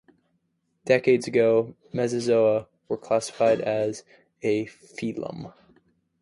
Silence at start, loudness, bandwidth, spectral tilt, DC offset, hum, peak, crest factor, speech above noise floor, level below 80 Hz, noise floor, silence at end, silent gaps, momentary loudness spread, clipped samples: 0.85 s; -24 LUFS; 11.5 kHz; -5.5 dB/octave; under 0.1%; none; -6 dBFS; 20 dB; 49 dB; -66 dBFS; -73 dBFS; 0.7 s; none; 15 LU; under 0.1%